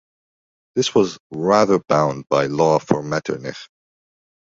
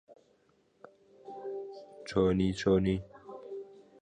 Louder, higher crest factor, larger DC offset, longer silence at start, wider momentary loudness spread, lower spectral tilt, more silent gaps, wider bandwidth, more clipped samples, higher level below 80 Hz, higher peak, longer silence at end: first, -19 LUFS vs -31 LUFS; about the same, 18 dB vs 20 dB; neither; first, 0.75 s vs 0.1 s; second, 11 LU vs 21 LU; second, -5.5 dB/octave vs -7 dB/octave; first, 1.20-1.30 s vs none; second, 7.8 kHz vs 9.8 kHz; neither; about the same, -56 dBFS vs -54 dBFS; first, -2 dBFS vs -14 dBFS; first, 0.85 s vs 0.2 s